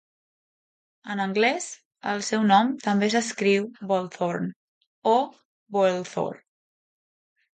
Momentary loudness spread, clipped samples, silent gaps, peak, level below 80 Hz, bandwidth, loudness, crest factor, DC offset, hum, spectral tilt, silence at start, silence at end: 13 LU; under 0.1%; 1.85-1.91 s, 4.56-4.81 s, 4.87-5.02 s, 5.45-5.66 s; -6 dBFS; -74 dBFS; 9.4 kHz; -25 LUFS; 20 dB; under 0.1%; none; -4.5 dB/octave; 1.05 s; 1.2 s